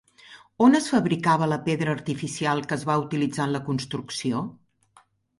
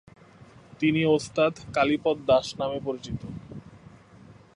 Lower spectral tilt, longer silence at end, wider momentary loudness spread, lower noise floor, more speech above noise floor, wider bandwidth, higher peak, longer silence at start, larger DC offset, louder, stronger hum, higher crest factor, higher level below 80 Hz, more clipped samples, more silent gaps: about the same, -5.5 dB/octave vs -6 dB/octave; first, 0.85 s vs 0.25 s; second, 10 LU vs 17 LU; first, -60 dBFS vs -51 dBFS; first, 36 dB vs 26 dB; about the same, 11.5 kHz vs 11 kHz; about the same, -6 dBFS vs -8 dBFS; second, 0.3 s vs 0.7 s; neither; about the same, -24 LUFS vs -26 LUFS; neither; about the same, 18 dB vs 18 dB; second, -62 dBFS vs -56 dBFS; neither; neither